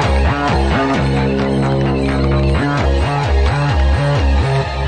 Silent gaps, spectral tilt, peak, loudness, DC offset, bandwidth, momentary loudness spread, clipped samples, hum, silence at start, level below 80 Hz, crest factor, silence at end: none; -7 dB/octave; -4 dBFS; -15 LUFS; under 0.1%; 9.2 kHz; 1 LU; under 0.1%; none; 0 s; -18 dBFS; 10 dB; 0 s